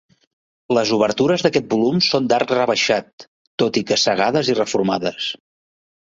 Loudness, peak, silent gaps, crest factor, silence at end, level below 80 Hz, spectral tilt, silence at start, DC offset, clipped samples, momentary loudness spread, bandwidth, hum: -18 LUFS; -2 dBFS; 3.13-3.18 s, 3.27-3.58 s; 18 dB; 0.75 s; -58 dBFS; -4 dB/octave; 0.7 s; under 0.1%; under 0.1%; 6 LU; 8 kHz; none